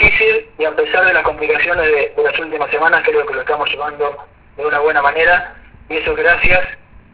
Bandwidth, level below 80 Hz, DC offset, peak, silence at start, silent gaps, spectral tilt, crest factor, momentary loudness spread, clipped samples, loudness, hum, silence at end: 4 kHz; -36 dBFS; under 0.1%; 0 dBFS; 0 s; none; -7 dB/octave; 14 dB; 9 LU; under 0.1%; -14 LUFS; none; 0.3 s